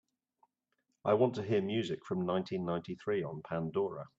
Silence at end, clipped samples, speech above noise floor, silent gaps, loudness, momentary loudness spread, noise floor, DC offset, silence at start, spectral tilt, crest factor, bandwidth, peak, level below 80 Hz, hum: 0.1 s; under 0.1%; 48 dB; none; -35 LUFS; 8 LU; -82 dBFS; under 0.1%; 1.05 s; -7.5 dB/octave; 20 dB; 7.8 kHz; -16 dBFS; -74 dBFS; none